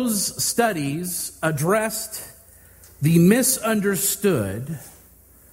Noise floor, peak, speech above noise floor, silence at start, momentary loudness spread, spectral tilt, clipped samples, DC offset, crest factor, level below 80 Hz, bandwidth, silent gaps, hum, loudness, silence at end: -51 dBFS; -4 dBFS; 30 dB; 0 s; 15 LU; -4.5 dB/octave; under 0.1%; under 0.1%; 20 dB; -54 dBFS; 16 kHz; none; none; -21 LUFS; 0.65 s